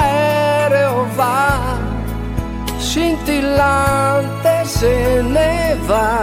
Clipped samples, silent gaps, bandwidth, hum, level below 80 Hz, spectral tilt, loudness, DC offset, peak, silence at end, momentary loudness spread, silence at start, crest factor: under 0.1%; none; 16.5 kHz; none; -26 dBFS; -5.5 dB/octave; -16 LUFS; under 0.1%; -2 dBFS; 0 s; 9 LU; 0 s; 12 dB